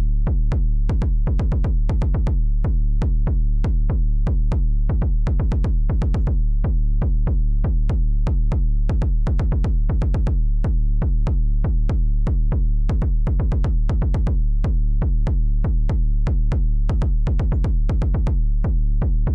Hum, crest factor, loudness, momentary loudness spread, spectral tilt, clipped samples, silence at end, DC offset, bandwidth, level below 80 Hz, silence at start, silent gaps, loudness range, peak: none; 4 dB; -22 LUFS; 1 LU; -9.5 dB/octave; under 0.1%; 0 s; under 0.1%; 3.1 kHz; -18 dBFS; 0 s; none; 0 LU; -12 dBFS